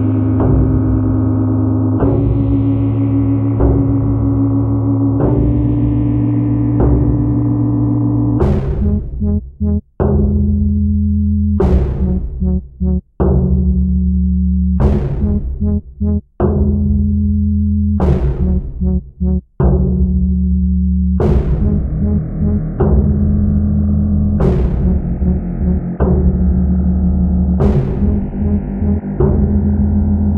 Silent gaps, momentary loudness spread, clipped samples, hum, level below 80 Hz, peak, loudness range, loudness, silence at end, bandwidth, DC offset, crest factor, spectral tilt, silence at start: none; 5 LU; under 0.1%; none; -20 dBFS; 0 dBFS; 2 LU; -15 LUFS; 0 s; 3.1 kHz; under 0.1%; 12 dB; -12.5 dB/octave; 0 s